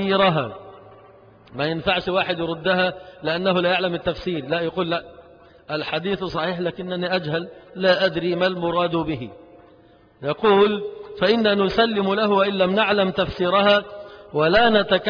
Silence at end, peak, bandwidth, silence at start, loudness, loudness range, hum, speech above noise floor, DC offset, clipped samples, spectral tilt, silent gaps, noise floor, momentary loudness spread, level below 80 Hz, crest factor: 0 s; -4 dBFS; 5.2 kHz; 0 s; -21 LUFS; 6 LU; none; 31 dB; under 0.1%; under 0.1%; -7 dB/octave; none; -52 dBFS; 12 LU; -50 dBFS; 18 dB